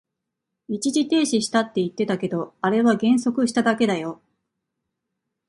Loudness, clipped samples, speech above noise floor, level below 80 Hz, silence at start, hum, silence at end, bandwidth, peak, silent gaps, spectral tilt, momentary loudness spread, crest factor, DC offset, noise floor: -22 LUFS; under 0.1%; 61 dB; -66 dBFS; 0.7 s; none; 1.35 s; 11.5 kHz; -6 dBFS; none; -4.5 dB/octave; 8 LU; 18 dB; under 0.1%; -82 dBFS